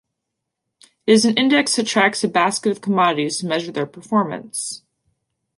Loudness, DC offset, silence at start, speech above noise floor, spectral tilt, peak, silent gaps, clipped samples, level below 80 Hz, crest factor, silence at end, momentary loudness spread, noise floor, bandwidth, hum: -19 LUFS; under 0.1%; 1.05 s; 61 dB; -3.5 dB/octave; -2 dBFS; none; under 0.1%; -68 dBFS; 18 dB; 0.8 s; 11 LU; -80 dBFS; 11.5 kHz; none